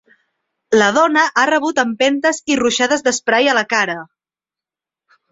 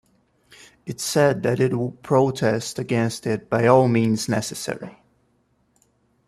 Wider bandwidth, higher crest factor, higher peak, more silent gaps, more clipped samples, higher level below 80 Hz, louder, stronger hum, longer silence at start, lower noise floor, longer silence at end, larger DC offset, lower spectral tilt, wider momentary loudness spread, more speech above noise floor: second, 8 kHz vs 14 kHz; about the same, 16 dB vs 20 dB; about the same, -2 dBFS vs -2 dBFS; neither; neither; about the same, -60 dBFS vs -60 dBFS; first, -15 LUFS vs -21 LUFS; neither; second, 0.7 s vs 0.85 s; first, -89 dBFS vs -65 dBFS; second, 1.25 s vs 1.4 s; neither; second, -2.5 dB/octave vs -5.5 dB/octave; second, 5 LU vs 14 LU; first, 74 dB vs 45 dB